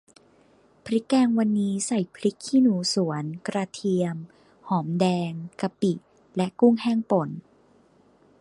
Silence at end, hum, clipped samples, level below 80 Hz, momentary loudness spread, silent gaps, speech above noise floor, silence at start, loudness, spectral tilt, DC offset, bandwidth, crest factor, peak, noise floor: 1 s; none; under 0.1%; -70 dBFS; 12 LU; none; 35 dB; 0.85 s; -25 LUFS; -6 dB/octave; under 0.1%; 11.5 kHz; 18 dB; -8 dBFS; -59 dBFS